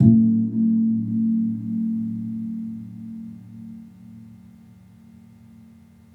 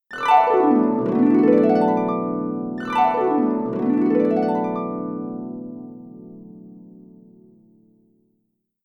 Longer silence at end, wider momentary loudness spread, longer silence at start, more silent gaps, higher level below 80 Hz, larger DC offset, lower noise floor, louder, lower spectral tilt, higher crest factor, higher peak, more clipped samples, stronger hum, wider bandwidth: second, 1.8 s vs 1.95 s; about the same, 22 LU vs 20 LU; about the same, 0 s vs 0.1 s; neither; about the same, -60 dBFS vs -64 dBFS; neither; second, -49 dBFS vs -72 dBFS; second, -22 LUFS vs -19 LUFS; first, -12.5 dB/octave vs -8 dB/octave; about the same, 22 dB vs 18 dB; about the same, -2 dBFS vs -4 dBFS; neither; neither; second, 1 kHz vs 8.2 kHz